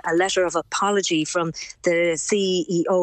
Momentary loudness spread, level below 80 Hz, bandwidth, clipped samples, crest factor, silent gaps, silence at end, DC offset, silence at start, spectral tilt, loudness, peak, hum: 4 LU; -60 dBFS; 9.4 kHz; under 0.1%; 14 dB; none; 0 s; under 0.1%; 0.05 s; -3.5 dB/octave; -22 LUFS; -8 dBFS; none